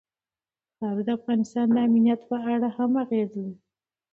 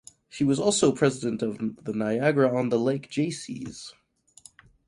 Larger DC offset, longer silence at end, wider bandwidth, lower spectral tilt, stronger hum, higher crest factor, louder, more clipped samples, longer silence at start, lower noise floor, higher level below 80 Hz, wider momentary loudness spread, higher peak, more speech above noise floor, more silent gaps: neither; second, 0.6 s vs 0.95 s; second, 7.6 kHz vs 11.5 kHz; first, -8 dB/octave vs -5 dB/octave; neither; second, 14 dB vs 20 dB; about the same, -25 LUFS vs -25 LUFS; neither; first, 0.8 s vs 0.35 s; first, under -90 dBFS vs -55 dBFS; second, -72 dBFS vs -64 dBFS; second, 11 LU vs 15 LU; second, -12 dBFS vs -8 dBFS; first, over 66 dB vs 29 dB; neither